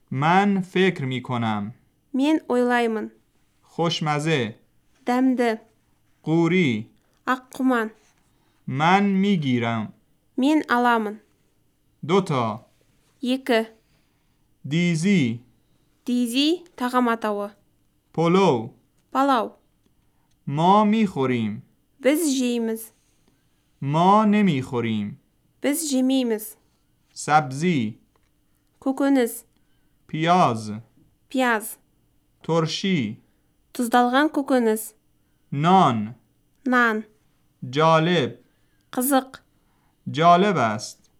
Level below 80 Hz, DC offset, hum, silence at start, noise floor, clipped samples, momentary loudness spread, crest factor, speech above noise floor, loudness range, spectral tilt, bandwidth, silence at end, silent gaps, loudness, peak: -68 dBFS; under 0.1%; none; 0.1 s; -65 dBFS; under 0.1%; 17 LU; 20 dB; 44 dB; 3 LU; -5.5 dB/octave; 17.5 kHz; 0.25 s; none; -22 LUFS; -4 dBFS